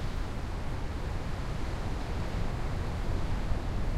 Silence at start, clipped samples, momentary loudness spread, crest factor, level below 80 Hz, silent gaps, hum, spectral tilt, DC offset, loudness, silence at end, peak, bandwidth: 0 s; under 0.1%; 3 LU; 14 dB; -34 dBFS; none; none; -6.5 dB/octave; under 0.1%; -36 LUFS; 0 s; -16 dBFS; 13 kHz